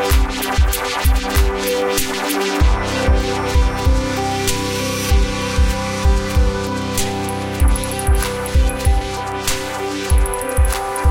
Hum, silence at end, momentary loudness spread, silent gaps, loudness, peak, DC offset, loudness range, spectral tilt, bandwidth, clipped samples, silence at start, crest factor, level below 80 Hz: none; 0 s; 4 LU; none; -18 LUFS; -4 dBFS; 0.4%; 1 LU; -4.5 dB/octave; 17 kHz; under 0.1%; 0 s; 12 dB; -18 dBFS